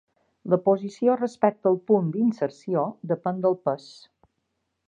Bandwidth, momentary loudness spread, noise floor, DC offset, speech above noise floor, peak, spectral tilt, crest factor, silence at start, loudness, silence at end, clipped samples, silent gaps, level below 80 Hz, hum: 9.2 kHz; 7 LU; -77 dBFS; under 0.1%; 53 dB; -6 dBFS; -8.5 dB/octave; 20 dB; 0.45 s; -25 LUFS; 1.1 s; under 0.1%; none; -74 dBFS; none